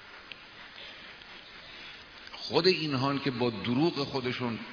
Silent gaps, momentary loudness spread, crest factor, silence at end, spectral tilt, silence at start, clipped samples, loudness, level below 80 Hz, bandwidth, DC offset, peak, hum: none; 20 LU; 22 dB; 0 s; -6 dB/octave; 0 s; under 0.1%; -29 LUFS; -66 dBFS; 5.4 kHz; under 0.1%; -10 dBFS; none